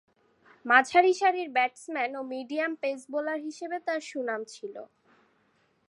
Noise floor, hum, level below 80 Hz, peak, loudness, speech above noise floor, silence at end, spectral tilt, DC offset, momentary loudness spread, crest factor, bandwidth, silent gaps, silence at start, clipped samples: -69 dBFS; none; -82 dBFS; -4 dBFS; -27 LUFS; 41 dB; 1.05 s; -2 dB/octave; under 0.1%; 17 LU; 24 dB; 11.5 kHz; none; 0.65 s; under 0.1%